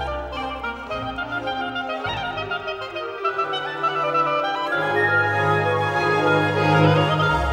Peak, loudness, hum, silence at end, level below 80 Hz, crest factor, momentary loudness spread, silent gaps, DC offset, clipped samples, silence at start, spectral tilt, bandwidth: -4 dBFS; -22 LUFS; none; 0 s; -40 dBFS; 18 dB; 10 LU; none; under 0.1%; under 0.1%; 0 s; -6 dB/octave; 12 kHz